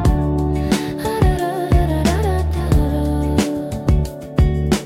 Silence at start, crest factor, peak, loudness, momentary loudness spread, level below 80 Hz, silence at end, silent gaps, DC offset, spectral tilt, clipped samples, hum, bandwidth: 0 s; 14 dB; -4 dBFS; -18 LUFS; 4 LU; -20 dBFS; 0 s; none; under 0.1%; -6.5 dB/octave; under 0.1%; none; 16 kHz